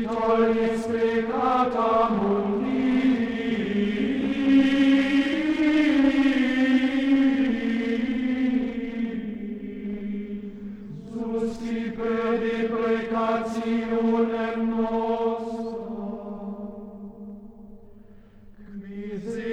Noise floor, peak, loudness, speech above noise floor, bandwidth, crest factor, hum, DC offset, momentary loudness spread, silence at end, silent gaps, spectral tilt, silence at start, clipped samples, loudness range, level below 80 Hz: -48 dBFS; -10 dBFS; -24 LUFS; 25 dB; 9 kHz; 16 dB; none; under 0.1%; 16 LU; 0 s; none; -6.5 dB/octave; 0 s; under 0.1%; 11 LU; -52 dBFS